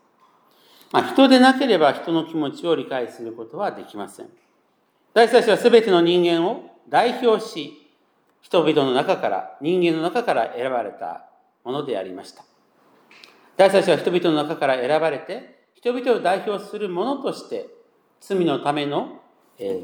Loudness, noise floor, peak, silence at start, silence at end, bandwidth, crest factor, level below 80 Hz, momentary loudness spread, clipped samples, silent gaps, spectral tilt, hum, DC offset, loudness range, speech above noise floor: -20 LUFS; -64 dBFS; -2 dBFS; 0.95 s; 0 s; 18 kHz; 20 dB; -82 dBFS; 18 LU; under 0.1%; none; -5.5 dB/octave; none; under 0.1%; 7 LU; 44 dB